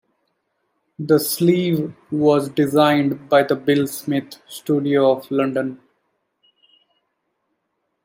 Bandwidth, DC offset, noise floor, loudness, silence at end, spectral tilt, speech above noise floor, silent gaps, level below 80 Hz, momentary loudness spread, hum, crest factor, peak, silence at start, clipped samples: 16 kHz; under 0.1%; -74 dBFS; -19 LUFS; 2.3 s; -6 dB/octave; 55 dB; none; -66 dBFS; 9 LU; none; 18 dB; -2 dBFS; 1 s; under 0.1%